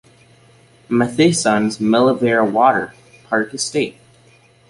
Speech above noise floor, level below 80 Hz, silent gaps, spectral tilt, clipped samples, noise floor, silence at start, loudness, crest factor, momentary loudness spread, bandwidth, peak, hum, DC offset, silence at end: 35 dB; -58 dBFS; none; -4.5 dB/octave; under 0.1%; -51 dBFS; 0.9 s; -17 LUFS; 16 dB; 8 LU; 11.5 kHz; -2 dBFS; none; under 0.1%; 0.8 s